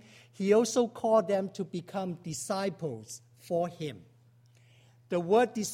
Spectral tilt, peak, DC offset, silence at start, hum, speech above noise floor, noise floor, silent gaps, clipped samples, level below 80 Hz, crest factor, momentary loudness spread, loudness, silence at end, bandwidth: -5 dB/octave; -12 dBFS; under 0.1%; 0.4 s; none; 32 dB; -61 dBFS; none; under 0.1%; -74 dBFS; 20 dB; 14 LU; -30 LUFS; 0 s; 16 kHz